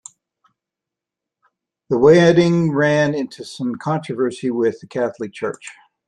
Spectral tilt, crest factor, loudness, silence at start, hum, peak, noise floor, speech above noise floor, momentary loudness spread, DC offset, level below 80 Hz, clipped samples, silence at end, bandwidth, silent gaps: -6.5 dB/octave; 18 dB; -18 LUFS; 1.9 s; none; -2 dBFS; -85 dBFS; 68 dB; 15 LU; under 0.1%; -56 dBFS; under 0.1%; 0.35 s; 10.5 kHz; none